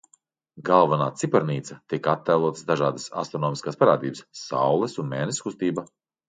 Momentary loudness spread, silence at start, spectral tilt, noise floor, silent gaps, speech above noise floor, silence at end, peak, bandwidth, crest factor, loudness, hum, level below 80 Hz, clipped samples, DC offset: 11 LU; 0.55 s; -5.5 dB/octave; -64 dBFS; none; 40 dB; 0.45 s; -4 dBFS; 9.6 kHz; 20 dB; -24 LUFS; none; -68 dBFS; under 0.1%; under 0.1%